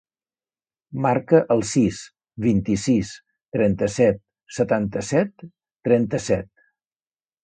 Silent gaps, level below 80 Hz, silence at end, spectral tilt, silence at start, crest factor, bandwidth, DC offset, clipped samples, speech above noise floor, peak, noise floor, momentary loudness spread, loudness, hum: none; -50 dBFS; 1 s; -6.5 dB/octave; 0.9 s; 20 dB; 9.4 kHz; under 0.1%; under 0.1%; over 70 dB; -2 dBFS; under -90 dBFS; 15 LU; -22 LUFS; none